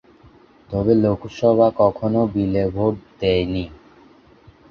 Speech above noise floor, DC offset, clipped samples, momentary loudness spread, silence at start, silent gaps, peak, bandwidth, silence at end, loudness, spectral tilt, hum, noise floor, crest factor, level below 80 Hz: 31 dB; under 0.1%; under 0.1%; 9 LU; 0.7 s; none; -2 dBFS; 6.8 kHz; 0.95 s; -19 LUFS; -8.5 dB/octave; none; -50 dBFS; 18 dB; -42 dBFS